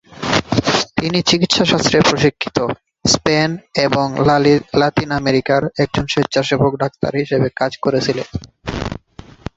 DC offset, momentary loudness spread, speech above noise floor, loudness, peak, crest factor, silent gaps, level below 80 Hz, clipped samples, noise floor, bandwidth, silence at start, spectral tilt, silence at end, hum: under 0.1%; 11 LU; 24 dB; -16 LUFS; 0 dBFS; 16 dB; none; -40 dBFS; under 0.1%; -40 dBFS; 8.2 kHz; 0.1 s; -4.5 dB/octave; 0.6 s; none